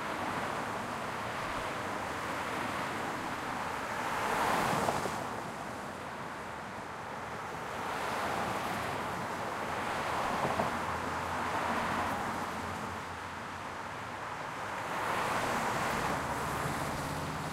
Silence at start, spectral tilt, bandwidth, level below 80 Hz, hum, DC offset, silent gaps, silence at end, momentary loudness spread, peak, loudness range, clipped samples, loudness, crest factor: 0 s; -4 dB/octave; 16 kHz; -58 dBFS; none; under 0.1%; none; 0 s; 8 LU; -14 dBFS; 4 LU; under 0.1%; -35 LUFS; 22 dB